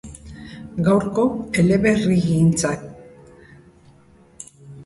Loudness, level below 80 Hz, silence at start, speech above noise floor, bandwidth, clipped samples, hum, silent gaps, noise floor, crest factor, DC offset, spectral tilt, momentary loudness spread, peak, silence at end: -19 LUFS; -46 dBFS; 0.05 s; 33 dB; 11.5 kHz; under 0.1%; none; none; -51 dBFS; 16 dB; under 0.1%; -6.5 dB/octave; 23 LU; -6 dBFS; 0 s